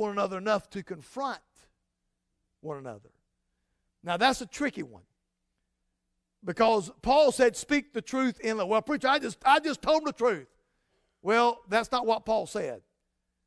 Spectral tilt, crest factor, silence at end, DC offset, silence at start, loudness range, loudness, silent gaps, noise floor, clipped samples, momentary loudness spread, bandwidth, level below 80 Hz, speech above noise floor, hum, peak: -4 dB/octave; 20 dB; 0.65 s; under 0.1%; 0 s; 9 LU; -27 LUFS; none; -81 dBFS; under 0.1%; 17 LU; 11 kHz; -60 dBFS; 53 dB; none; -10 dBFS